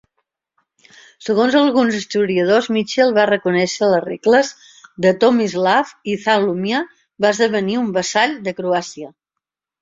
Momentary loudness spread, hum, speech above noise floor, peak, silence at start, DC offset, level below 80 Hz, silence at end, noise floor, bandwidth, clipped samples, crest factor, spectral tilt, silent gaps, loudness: 9 LU; none; 66 dB; -2 dBFS; 1.2 s; under 0.1%; -62 dBFS; 0.7 s; -82 dBFS; 7.8 kHz; under 0.1%; 16 dB; -4.5 dB/octave; none; -17 LUFS